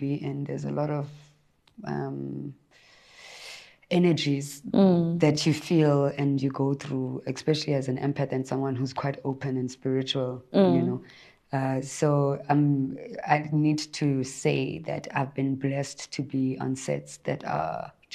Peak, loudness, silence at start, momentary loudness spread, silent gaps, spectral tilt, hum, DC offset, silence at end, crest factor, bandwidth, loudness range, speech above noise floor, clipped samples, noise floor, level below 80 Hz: -6 dBFS; -27 LUFS; 0 s; 12 LU; none; -6.5 dB/octave; none; under 0.1%; 0 s; 20 dB; 13 kHz; 6 LU; 23 dB; under 0.1%; -50 dBFS; -66 dBFS